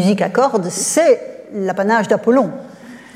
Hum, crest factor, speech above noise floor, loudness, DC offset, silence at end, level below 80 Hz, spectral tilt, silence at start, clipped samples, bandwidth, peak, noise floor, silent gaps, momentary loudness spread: none; 14 dB; 22 dB; -16 LUFS; under 0.1%; 0.15 s; -66 dBFS; -4.5 dB/octave; 0 s; under 0.1%; 16 kHz; -2 dBFS; -37 dBFS; none; 12 LU